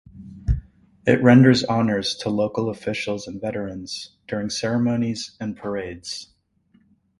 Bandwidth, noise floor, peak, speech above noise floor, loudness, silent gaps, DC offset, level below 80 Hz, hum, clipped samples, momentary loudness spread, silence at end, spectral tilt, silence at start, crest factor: 11.5 kHz; -61 dBFS; 0 dBFS; 40 dB; -22 LUFS; none; under 0.1%; -38 dBFS; none; under 0.1%; 18 LU; 0.95 s; -6 dB/octave; 0.15 s; 22 dB